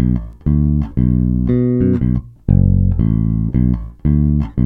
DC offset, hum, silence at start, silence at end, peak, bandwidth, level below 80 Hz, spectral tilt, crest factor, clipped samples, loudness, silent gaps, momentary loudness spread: under 0.1%; none; 0 s; 0 s; 0 dBFS; 3.4 kHz; -22 dBFS; -13 dB/octave; 14 dB; under 0.1%; -16 LUFS; none; 4 LU